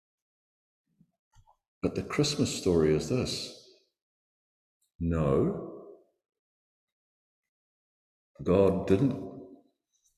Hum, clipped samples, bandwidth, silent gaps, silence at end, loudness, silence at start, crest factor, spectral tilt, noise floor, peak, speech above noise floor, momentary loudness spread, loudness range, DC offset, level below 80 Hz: none; under 0.1%; 14 kHz; 4.02-4.80 s, 4.95-4.99 s, 6.39-7.43 s, 7.49-8.35 s; 0.65 s; -29 LUFS; 1.85 s; 22 dB; -6 dB/octave; -74 dBFS; -10 dBFS; 47 dB; 16 LU; 4 LU; under 0.1%; -50 dBFS